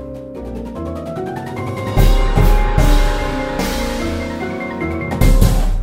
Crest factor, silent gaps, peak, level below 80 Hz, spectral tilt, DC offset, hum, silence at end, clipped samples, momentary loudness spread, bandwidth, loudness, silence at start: 16 dB; none; 0 dBFS; -16 dBFS; -6 dB/octave; under 0.1%; none; 0 s; under 0.1%; 11 LU; 16.5 kHz; -19 LUFS; 0 s